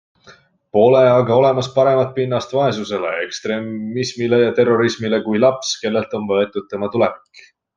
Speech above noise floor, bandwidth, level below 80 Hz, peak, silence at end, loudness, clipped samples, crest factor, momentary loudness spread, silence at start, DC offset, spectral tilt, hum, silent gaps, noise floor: 32 dB; 9.2 kHz; -60 dBFS; -2 dBFS; 0.6 s; -17 LUFS; under 0.1%; 16 dB; 10 LU; 0.3 s; under 0.1%; -5.5 dB/octave; none; none; -48 dBFS